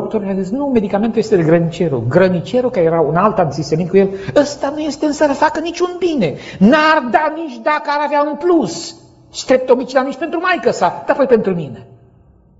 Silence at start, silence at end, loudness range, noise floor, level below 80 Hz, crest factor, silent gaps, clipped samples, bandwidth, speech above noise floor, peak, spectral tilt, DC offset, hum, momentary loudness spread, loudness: 0 s; 0.75 s; 2 LU; -48 dBFS; -48 dBFS; 14 dB; none; under 0.1%; 8 kHz; 33 dB; 0 dBFS; -6 dB/octave; under 0.1%; none; 8 LU; -15 LUFS